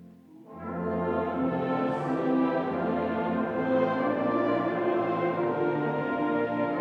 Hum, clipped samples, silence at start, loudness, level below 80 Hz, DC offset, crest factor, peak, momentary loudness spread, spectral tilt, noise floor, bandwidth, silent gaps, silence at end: none; under 0.1%; 0 s; -28 LUFS; -62 dBFS; under 0.1%; 14 dB; -12 dBFS; 3 LU; -9 dB/octave; -50 dBFS; 6 kHz; none; 0 s